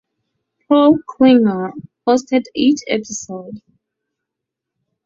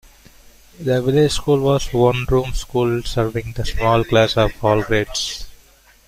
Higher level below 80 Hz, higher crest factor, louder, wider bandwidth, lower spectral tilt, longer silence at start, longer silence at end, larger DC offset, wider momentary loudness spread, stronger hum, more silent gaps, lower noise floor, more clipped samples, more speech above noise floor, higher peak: second, -60 dBFS vs -32 dBFS; about the same, 16 dB vs 16 dB; first, -15 LUFS vs -18 LUFS; second, 7.8 kHz vs 16 kHz; about the same, -5 dB/octave vs -5.5 dB/octave; about the same, 0.7 s vs 0.8 s; first, 1.45 s vs 0.5 s; neither; first, 16 LU vs 8 LU; neither; neither; first, -81 dBFS vs -50 dBFS; neither; first, 67 dB vs 33 dB; about the same, 0 dBFS vs -2 dBFS